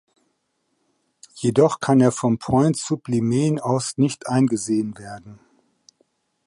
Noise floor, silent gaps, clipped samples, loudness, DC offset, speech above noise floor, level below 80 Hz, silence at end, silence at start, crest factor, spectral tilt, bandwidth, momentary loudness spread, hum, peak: -72 dBFS; none; under 0.1%; -20 LUFS; under 0.1%; 52 dB; -56 dBFS; 1.1 s; 1.35 s; 18 dB; -6.5 dB/octave; 11.5 kHz; 8 LU; none; -4 dBFS